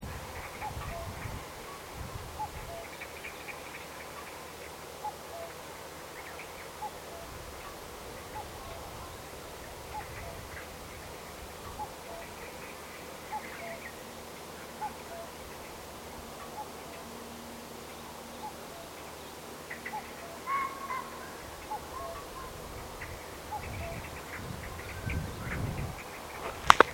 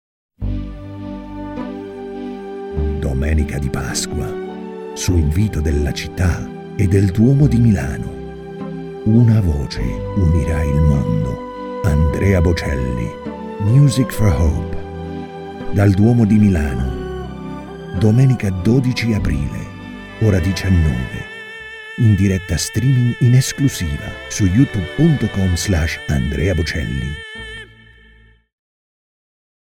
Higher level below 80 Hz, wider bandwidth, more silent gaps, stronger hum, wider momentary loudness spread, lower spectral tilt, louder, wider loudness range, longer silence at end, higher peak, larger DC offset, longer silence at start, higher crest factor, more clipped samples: second, -52 dBFS vs -26 dBFS; about the same, 17 kHz vs 16.5 kHz; neither; neither; second, 7 LU vs 16 LU; second, -3.5 dB/octave vs -6.5 dB/octave; second, -39 LUFS vs -17 LUFS; about the same, 4 LU vs 6 LU; second, 0 s vs 2.1 s; about the same, 0 dBFS vs 0 dBFS; neither; second, 0 s vs 0.4 s; first, 38 dB vs 16 dB; neither